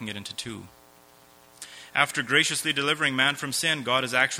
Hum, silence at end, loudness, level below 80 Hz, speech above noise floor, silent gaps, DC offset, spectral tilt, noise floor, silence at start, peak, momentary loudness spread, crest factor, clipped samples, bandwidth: none; 0 s; -24 LUFS; -68 dBFS; 29 dB; none; under 0.1%; -2 dB/octave; -55 dBFS; 0 s; -4 dBFS; 20 LU; 22 dB; under 0.1%; over 20 kHz